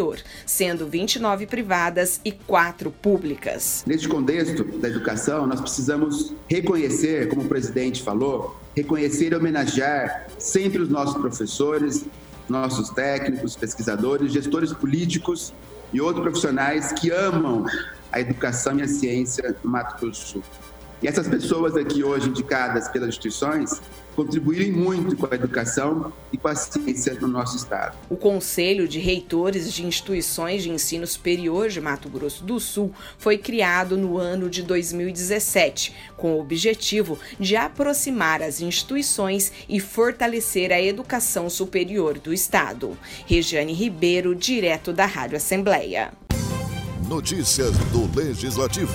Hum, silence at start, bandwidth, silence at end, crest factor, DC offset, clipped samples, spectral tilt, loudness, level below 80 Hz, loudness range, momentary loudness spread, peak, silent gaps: none; 0 s; over 20 kHz; 0 s; 20 dB; under 0.1%; under 0.1%; -4 dB/octave; -23 LUFS; -44 dBFS; 3 LU; 7 LU; -4 dBFS; none